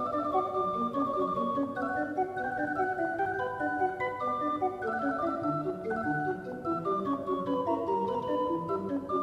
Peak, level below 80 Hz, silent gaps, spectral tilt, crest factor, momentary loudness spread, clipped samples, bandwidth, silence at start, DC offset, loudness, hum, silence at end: -16 dBFS; -64 dBFS; none; -7.5 dB/octave; 14 dB; 3 LU; under 0.1%; 12.5 kHz; 0 s; under 0.1%; -31 LUFS; none; 0 s